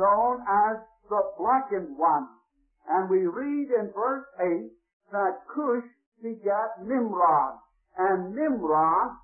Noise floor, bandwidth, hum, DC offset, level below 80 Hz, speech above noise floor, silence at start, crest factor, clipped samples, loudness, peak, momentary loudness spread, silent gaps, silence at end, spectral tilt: -64 dBFS; 2.8 kHz; none; under 0.1%; -66 dBFS; 39 dB; 0 s; 14 dB; under 0.1%; -26 LUFS; -12 dBFS; 10 LU; 4.93-5.00 s, 6.06-6.12 s; 0.05 s; -12.5 dB/octave